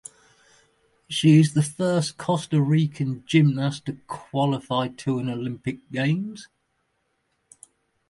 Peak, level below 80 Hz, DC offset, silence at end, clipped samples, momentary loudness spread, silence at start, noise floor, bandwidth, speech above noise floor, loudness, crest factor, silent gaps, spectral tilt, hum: -6 dBFS; -64 dBFS; under 0.1%; 1.65 s; under 0.1%; 15 LU; 1.1 s; -73 dBFS; 11.5 kHz; 50 dB; -23 LUFS; 18 dB; none; -6.5 dB/octave; none